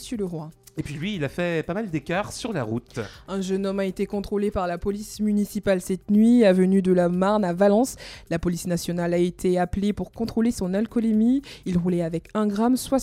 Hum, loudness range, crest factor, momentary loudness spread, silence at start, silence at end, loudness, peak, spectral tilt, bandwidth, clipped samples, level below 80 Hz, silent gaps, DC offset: none; 7 LU; 18 dB; 11 LU; 0 s; 0 s; -24 LUFS; -6 dBFS; -6.5 dB/octave; 15.5 kHz; under 0.1%; -46 dBFS; none; under 0.1%